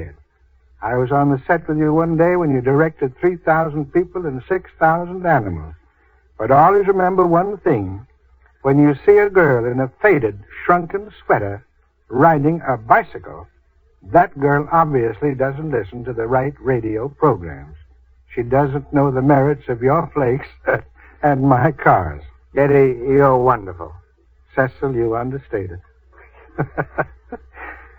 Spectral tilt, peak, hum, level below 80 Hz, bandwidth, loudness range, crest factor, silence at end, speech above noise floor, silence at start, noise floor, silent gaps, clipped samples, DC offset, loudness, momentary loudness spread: -10.5 dB/octave; 0 dBFS; none; -44 dBFS; over 20 kHz; 5 LU; 18 dB; 0.2 s; 38 dB; 0 s; -55 dBFS; none; under 0.1%; under 0.1%; -17 LUFS; 15 LU